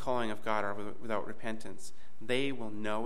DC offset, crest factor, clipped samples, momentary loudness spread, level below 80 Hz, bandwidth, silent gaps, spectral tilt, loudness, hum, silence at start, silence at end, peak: 3%; 20 dB; under 0.1%; 15 LU; -68 dBFS; 15.5 kHz; none; -5 dB/octave; -36 LUFS; none; 0 s; 0 s; -18 dBFS